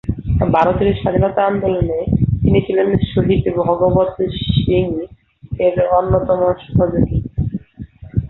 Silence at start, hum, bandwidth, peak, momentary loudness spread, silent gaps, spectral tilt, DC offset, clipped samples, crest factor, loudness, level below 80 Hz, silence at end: 0.05 s; none; 4.2 kHz; -2 dBFS; 8 LU; none; -10.5 dB/octave; under 0.1%; under 0.1%; 14 dB; -16 LUFS; -30 dBFS; 0 s